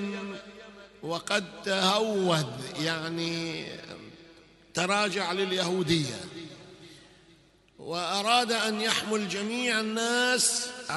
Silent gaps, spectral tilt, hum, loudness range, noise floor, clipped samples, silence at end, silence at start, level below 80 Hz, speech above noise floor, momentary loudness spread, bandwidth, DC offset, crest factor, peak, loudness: none; -3 dB/octave; none; 4 LU; -60 dBFS; under 0.1%; 0 s; 0 s; -66 dBFS; 31 dB; 19 LU; 12 kHz; under 0.1%; 22 dB; -8 dBFS; -28 LUFS